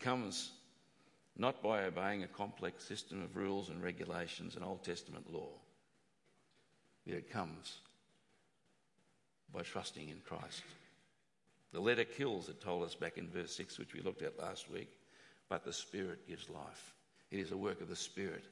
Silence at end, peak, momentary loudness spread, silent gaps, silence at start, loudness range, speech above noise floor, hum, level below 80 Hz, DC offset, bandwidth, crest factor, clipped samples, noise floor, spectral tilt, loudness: 0 s; -18 dBFS; 14 LU; none; 0 s; 10 LU; 36 dB; none; -82 dBFS; under 0.1%; 11.5 kHz; 26 dB; under 0.1%; -79 dBFS; -4 dB/octave; -44 LUFS